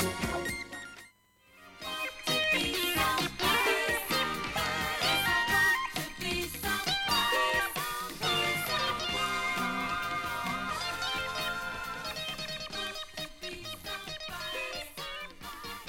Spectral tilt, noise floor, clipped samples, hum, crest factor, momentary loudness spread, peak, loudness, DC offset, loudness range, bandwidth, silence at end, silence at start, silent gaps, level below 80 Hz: -2.5 dB/octave; -62 dBFS; under 0.1%; none; 18 dB; 13 LU; -16 dBFS; -31 LUFS; under 0.1%; 9 LU; 17 kHz; 0 s; 0 s; none; -54 dBFS